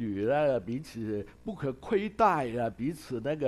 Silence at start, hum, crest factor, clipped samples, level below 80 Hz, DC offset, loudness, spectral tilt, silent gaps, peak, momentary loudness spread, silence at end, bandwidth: 0 s; none; 18 dB; under 0.1%; -58 dBFS; under 0.1%; -31 LUFS; -7 dB/octave; none; -12 dBFS; 10 LU; 0 s; 13 kHz